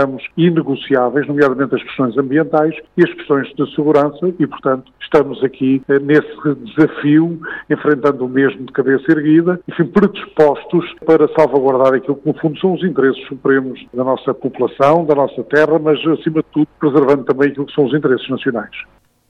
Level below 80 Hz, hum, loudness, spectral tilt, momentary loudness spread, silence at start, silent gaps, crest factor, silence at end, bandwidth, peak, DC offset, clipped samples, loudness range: -54 dBFS; none; -15 LUFS; -8.5 dB/octave; 7 LU; 0 s; none; 12 dB; 0.45 s; 6.6 kHz; -2 dBFS; under 0.1%; under 0.1%; 2 LU